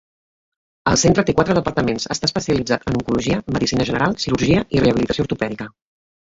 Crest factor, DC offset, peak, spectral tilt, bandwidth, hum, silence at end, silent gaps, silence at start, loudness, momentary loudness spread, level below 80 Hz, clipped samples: 18 dB; under 0.1%; -2 dBFS; -5 dB/octave; 8 kHz; none; 0.55 s; none; 0.85 s; -19 LUFS; 7 LU; -40 dBFS; under 0.1%